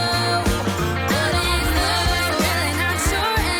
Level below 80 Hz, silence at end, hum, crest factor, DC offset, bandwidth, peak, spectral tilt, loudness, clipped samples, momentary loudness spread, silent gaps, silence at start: -30 dBFS; 0 s; none; 12 dB; under 0.1%; over 20 kHz; -8 dBFS; -3.5 dB/octave; -19 LUFS; under 0.1%; 3 LU; none; 0 s